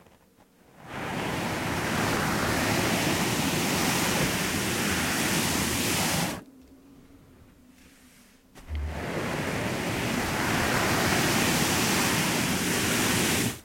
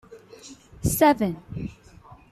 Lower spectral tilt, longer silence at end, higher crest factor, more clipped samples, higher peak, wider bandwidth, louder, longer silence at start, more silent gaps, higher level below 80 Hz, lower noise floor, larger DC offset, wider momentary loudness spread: second, -3.5 dB/octave vs -5.5 dB/octave; second, 0 s vs 0.15 s; second, 16 dB vs 22 dB; neither; second, -12 dBFS vs -6 dBFS; about the same, 16.5 kHz vs 15 kHz; second, -26 LUFS vs -23 LUFS; first, 0.8 s vs 0.1 s; neither; about the same, -48 dBFS vs -46 dBFS; first, -59 dBFS vs -49 dBFS; neither; second, 8 LU vs 25 LU